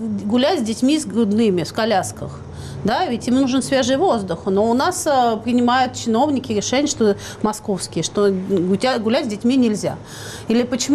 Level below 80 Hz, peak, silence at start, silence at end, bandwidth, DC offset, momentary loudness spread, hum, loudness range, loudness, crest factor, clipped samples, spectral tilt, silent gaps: -48 dBFS; -8 dBFS; 0 s; 0 s; 14 kHz; under 0.1%; 7 LU; none; 2 LU; -19 LUFS; 10 dB; under 0.1%; -4.5 dB/octave; none